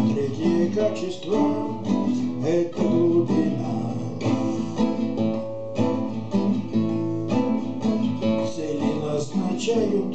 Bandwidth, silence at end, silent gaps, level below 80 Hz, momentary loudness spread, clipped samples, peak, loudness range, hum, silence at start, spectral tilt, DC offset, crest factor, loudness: 8.6 kHz; 0 s; none; -62 dBFS; 5 LU; under 0.1%; -10 dBFS; 2 LU; none; 0 s; -7 dB/octave; 1%; 14 dB; -24 LUFS